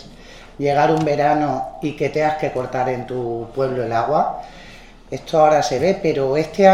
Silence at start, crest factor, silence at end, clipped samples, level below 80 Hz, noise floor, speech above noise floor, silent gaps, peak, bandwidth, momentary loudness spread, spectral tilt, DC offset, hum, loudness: 0 s; 18 dB; 0 s; under 0.1%; -46 dBFS; -41 dBFS; 23 dB; none; 0 dBFS; 13 kHz; 11 LU; -6 dB/octave; 0.3%; none; -19 LUFS